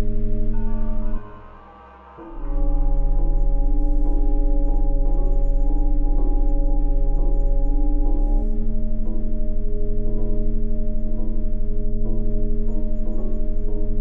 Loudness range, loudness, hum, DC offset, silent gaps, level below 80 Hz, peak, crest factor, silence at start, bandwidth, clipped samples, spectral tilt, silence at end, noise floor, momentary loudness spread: 4 LU; -27 LUFS; none; under 0.1%; none; -18 dBFS; -8 dBFS; 8 dB; 0 s; 1.6 kHz; under 0.1%; -12 dB/octave; 0 s; -43 dBFS; 5 LU